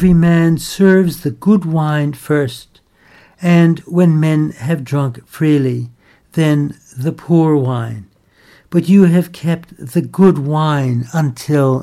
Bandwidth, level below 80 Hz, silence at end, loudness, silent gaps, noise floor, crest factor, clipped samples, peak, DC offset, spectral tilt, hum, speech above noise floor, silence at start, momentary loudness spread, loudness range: 14 kHz; -42 dBFS; 0 s; -14 LUFS; none; -48 dBFS; 14 dB; under 0.1%; 0 dBFS; under 0.1%; -7.5 dB/octave; none; 35 dB; 0 s; 11 LU; 2 LU